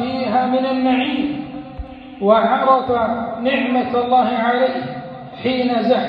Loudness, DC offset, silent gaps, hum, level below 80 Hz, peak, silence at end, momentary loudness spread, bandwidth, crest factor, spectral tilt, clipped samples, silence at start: -18 LUFS; under 0.1%; none; none; -46 dBFS; -2 dBFS; 0 s; 16 LU; 5.4 kHz; 16 dB; -8 dB/octave; under 0.1%; 0 s